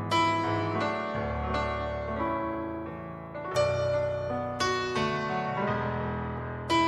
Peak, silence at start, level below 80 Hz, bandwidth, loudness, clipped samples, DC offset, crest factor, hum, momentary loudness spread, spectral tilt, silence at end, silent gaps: -14 dBFS; 0 s; -46 dBFS; 12.5 kHz; -30 LUFS; under 0.1%; under 0.1%; 16 dB; none; 9 LU; -5.5 dB/octave; 0 s; none